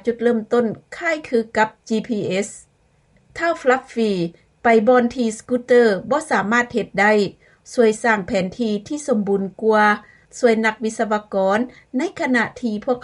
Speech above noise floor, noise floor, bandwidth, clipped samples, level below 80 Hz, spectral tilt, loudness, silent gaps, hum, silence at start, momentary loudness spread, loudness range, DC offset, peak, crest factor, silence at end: 39 dB; -58 dBFS; 11.5 kHz; under 0.1%; -58 dBFS; -5 dB/octave; -19 LUFS; none; none; 0.05 s; 9 LU; 5 LU; under 0.1%; -4 dBFS; 14 dB; 0.05 s